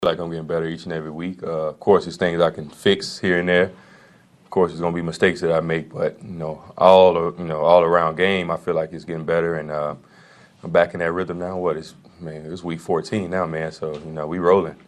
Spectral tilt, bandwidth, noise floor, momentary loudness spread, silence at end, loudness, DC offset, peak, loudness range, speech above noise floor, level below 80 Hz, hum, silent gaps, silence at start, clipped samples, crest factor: -6 dB/octave; 12 kHz; -52 dBFS; 14 LU; 0.1 s; -21 LUFS; under 0.1%; 0 dBFS; 7 LU; 31 dB; -54 dBFS; none; none; 0 s; under 0.1%; 20 dB